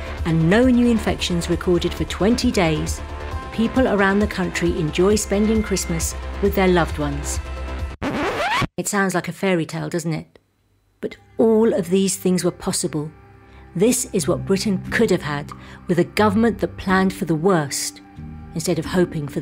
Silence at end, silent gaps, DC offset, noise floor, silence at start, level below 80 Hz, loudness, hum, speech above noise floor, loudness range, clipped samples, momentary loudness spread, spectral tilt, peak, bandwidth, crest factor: 0 s; none; under 0.1%; -62 dBFS; 0 s; -34 dBFS; -20 LUFS; none; 43 dB; 3 LU; under 0.1%; 12 LU; -5 dB/octave; -2 dBFS; 16 kHz; 18 dB